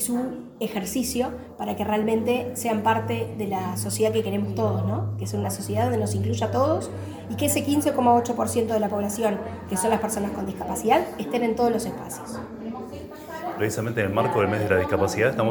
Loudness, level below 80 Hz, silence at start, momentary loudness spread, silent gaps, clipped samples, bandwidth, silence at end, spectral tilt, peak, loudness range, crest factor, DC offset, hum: -25 LUFS; -54 dBFS; 0 s; 12 LU; none; under 0.1%; 19.5 kHz; 0 s; -5.5 dB/octave; -6 dBFS; 3 LU; 18 dB; under 0.1%; none